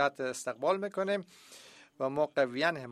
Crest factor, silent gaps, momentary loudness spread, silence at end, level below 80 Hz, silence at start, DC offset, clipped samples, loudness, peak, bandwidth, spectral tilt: 18 dB; none; 21 LU; 0 s; -76 dBFS; 0 s; under 0.1%; under 0.1%; -32 LUFS; -14 dBFS; 14 kHz; -4 dB/octave